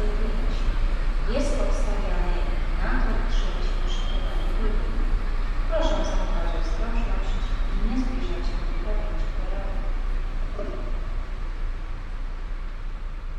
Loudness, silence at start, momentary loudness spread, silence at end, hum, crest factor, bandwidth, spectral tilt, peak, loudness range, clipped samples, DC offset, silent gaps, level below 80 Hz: -30 LUFS; 0 s; 9 LU; 0 s; none; 14 dB; 7.4 kHz; -6 dB/octave; -10 dBFS; 5 LU; under 0.1%; under 0.1%; none; -24 dBFS